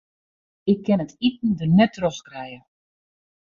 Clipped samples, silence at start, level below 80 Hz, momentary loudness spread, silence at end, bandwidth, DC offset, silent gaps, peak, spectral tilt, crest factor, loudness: under 0.1%; 0.65 s; -58 dBFS; 18 LU; 0.9 s; 7.4 kHz; under 0.1%; none; -4 dBFS; -7 dB/octave; 18 dB; -21 LUFS